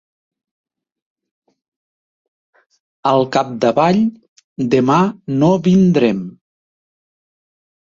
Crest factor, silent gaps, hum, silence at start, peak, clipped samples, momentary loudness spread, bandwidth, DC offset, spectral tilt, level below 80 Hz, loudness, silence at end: 18 dB; 4.28-4.36 s, 4.44-4.56 s; none; 3.05 s; 0 dBFS; under 0.1%; 11 LU; 7.4 kHz; under 0.1%; -7.5 dB/octave; -56 dBFS; -15 LUFS; 1.55 s